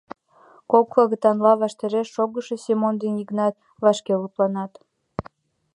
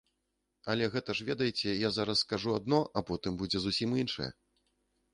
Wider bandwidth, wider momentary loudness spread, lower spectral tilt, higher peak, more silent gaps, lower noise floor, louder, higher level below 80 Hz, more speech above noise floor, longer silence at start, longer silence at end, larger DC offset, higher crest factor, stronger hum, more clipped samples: about the same, 11 kHz vs 11 kHz; first, 14 LU vs 6 LU; first, -6.5 dB/octave vs -5 dB/octave; first, -2 dBFS vs -14 dBFS; neither; second, -54 dBFS vs -82 dBFS; first, -21 LUFS vs -32 LUFS; about the same, -60 dBFS vs -60 dBFS; second, 33 dB vs 49 dB; about the same, 0.7 s vs 0.65 s; second, 0.55 s vs 0.8 s; neither; about the same, 20 dB vs 20 dB; neither; neither